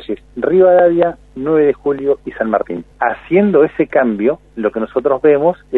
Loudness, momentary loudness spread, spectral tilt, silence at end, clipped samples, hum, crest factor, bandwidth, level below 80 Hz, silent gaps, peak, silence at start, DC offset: -14 LUFS; 9 LU; -9.5 dB/octave; 0 s; under 0.1%; none; 14 dB; 4.1 kHz; -46 dBFS; none; 0 dBFS; 0 s; under 0.1%